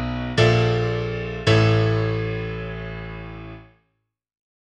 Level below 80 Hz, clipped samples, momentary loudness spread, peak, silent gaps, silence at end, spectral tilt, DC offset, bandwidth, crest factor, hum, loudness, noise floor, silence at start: -38 dBFS; under 0.1%; 18 LU; -4 dBFS; none; 0.95 s; -6.5 dB/octave; under 0.1%; 9 kHz; 20 dB; none; -21 LUFS; -75 dBFS; 0 s